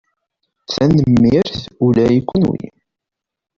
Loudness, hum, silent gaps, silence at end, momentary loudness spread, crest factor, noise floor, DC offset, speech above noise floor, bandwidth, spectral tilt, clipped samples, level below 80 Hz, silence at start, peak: -15 LUFS; none; none; 0.9 s; 12 LU; 14 dB; -83 dBFS; under 0.1%; 70 dB; 7.4 kHz; -8 dB/octave; under 0.1%; -42 dBFS; 0.7 s; -2 dBFS